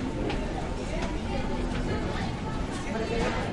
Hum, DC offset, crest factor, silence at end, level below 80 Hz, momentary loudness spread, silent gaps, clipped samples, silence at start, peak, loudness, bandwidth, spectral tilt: none; under 0.1%; 14 dB; 0 s; -36 dBFS; 4 LU; none; under 0.1%; 0 s; -16 dBFS; -31 LUFS; 11.5 kHz; -6 dB/octave